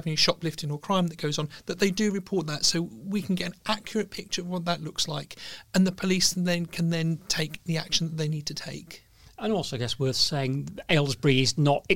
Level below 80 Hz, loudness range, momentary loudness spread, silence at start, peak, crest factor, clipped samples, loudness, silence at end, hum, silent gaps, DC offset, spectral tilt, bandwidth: -54 dBFS; 3 LU; 10 LU; 0 s; -8 dBFS; 20 dB; under 0.1%; -27 LUFS; 0 s; none; none; 0.4%; -4 dB/octave; 17 kHz